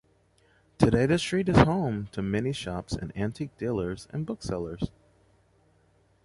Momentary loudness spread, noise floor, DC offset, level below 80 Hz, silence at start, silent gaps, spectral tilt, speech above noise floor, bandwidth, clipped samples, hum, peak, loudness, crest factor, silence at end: 13 LU; -65 dBFS; under 0.1%; -46 dBFS; 0.8 s; none; -6.5 dB/octave; 38 dB; 11.5 kHz; under 0.1%; none; -6 dBFS; -28 LUFS; 24 dB; 1.4 s